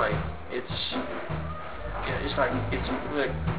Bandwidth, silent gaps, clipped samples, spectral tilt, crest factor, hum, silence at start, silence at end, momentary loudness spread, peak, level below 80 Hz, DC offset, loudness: 4 kHz; none; under 0.1%; -4 dB/octave; 18 dB; none; 0 s; 0 s; 8 LU; -12 dBFS; -40 dBFS; 1%; -30 LUFS